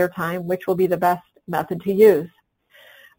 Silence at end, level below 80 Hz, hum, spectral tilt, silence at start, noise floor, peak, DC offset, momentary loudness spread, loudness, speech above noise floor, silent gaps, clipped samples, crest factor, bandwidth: 0.9 s; -60 dBFS; none; -7 dB/octave; 0 s; -55 dBFS; -2 dBFS; under 0.1%; 13 LU; -20 LUFS; 36 dB; none; under 0.1%; 18 dB; 17 kHz